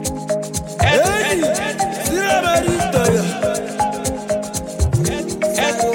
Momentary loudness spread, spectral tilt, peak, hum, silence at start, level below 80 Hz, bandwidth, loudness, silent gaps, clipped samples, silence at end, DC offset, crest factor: 7 LU; -4 dB/octave; -2 dBFS; none; 0 s; -32 dBFS; 17 kHz; -18 LUFS; none; under 0.1%; 0 s; under 0.1%; 16 dB